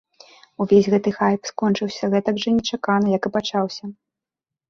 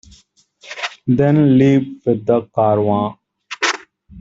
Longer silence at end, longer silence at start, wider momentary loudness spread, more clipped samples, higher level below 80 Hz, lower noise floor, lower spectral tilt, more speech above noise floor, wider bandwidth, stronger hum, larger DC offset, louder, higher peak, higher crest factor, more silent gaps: first, 0.75 s vs 0 s; about the same, 0.6 s vs 0.65 s; second, 9 LU vs 14 LU; neither; second, -58 dBFS vs -52 dBFS; first, -88 dBFS vs -53 dBFS; about the same, -6 dB/octave vs -6.5 dB/octave; first, 68 dB vs 39 dB; about the same, 7.2 kHz vs 7.8 kHz; neither; neither; second, -20 LUFS vs -16 LUFS; about the same, -4 dBFS vs -2 dBFS; about the same, 18 dB vs 14 dB; neither